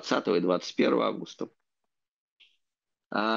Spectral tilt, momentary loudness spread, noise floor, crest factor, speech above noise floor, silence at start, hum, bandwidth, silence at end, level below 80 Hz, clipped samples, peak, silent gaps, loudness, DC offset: -5 dB/octave; 15 LU; -87 dBFS; 20 dB; 59 dB; 0 s; none; 7.6 kHz; 0 s; -78 dBFS; under 0.1%; -10 dBFS; 2.08-2.37 s; -28 LUFS; under 0.1%